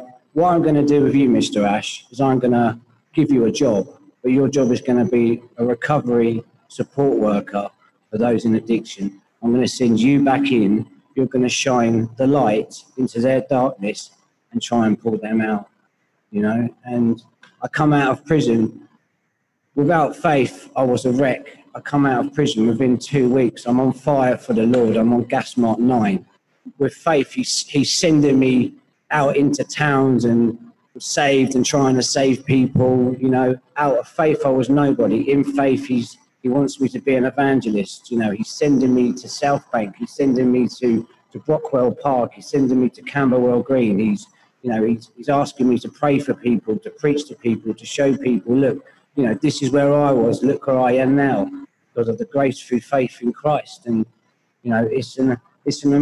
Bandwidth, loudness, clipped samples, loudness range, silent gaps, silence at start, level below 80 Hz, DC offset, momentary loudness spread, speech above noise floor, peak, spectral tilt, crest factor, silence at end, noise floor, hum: 12 kHz; -18 LUFS; under 0.1%; 3 LU; none; 0 s; -56 dBFS; under 0.1%; 10 LU; 52 dB; -2 dBFS; -6 dB/octave; 16 dB; 0 s; -70 dBFS; none